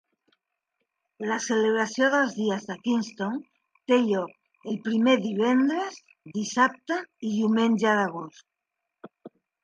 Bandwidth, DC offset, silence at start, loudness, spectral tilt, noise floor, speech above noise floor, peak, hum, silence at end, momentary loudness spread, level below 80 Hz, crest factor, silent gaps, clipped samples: 9.2 kHz; under 0.1%; 1.2 s; -25 LUFS; -4.5 dB/octave; -84 dBFS; 59 dB; -8 dBFS; none; 0.35 s; 13 LU; -78 dBFS; 18 dB; none; under 0.1%